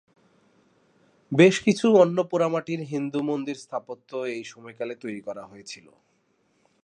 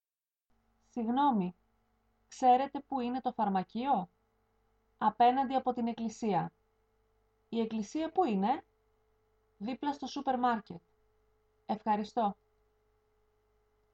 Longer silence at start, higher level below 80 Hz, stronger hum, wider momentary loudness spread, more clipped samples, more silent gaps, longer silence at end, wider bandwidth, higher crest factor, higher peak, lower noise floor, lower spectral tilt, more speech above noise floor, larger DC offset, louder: first, 1.3 s vs 0.95 s; about the same, -72 dBFS vs -72 dBFS; second, none vs 50 Hz at -65 dBFS; first, 21 LU vs 13 LU; neither; neither; second, 1.1 s vs 1.6 s; first, 10.5 kHz vs 8.2 kHz; about the same, 22 dB vs 20 dB; first, -4 dBFS vs -16 dBFS; second, -68 dBFS vs under -90 dBFS; about the same, -6 dB/octave vs -6.5 dB/octave; second, 44 dB vs over 58 dB; neither; first, -24 LUFS vs -33 LUFS